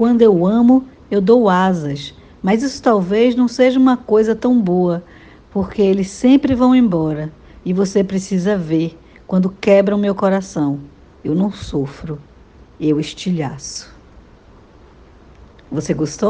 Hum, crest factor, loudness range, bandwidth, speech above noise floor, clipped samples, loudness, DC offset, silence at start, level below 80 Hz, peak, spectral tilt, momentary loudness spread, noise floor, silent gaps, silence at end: none; 16 dB; 10 LU; 9.2 kHz; 30 dB; under 0.1%; -16 LUFS; under 0.1%; 0 s; -46 dBFS; 0 dBFS; -7 dB/octave; 14 LU; -45 dBFS; none; 0 s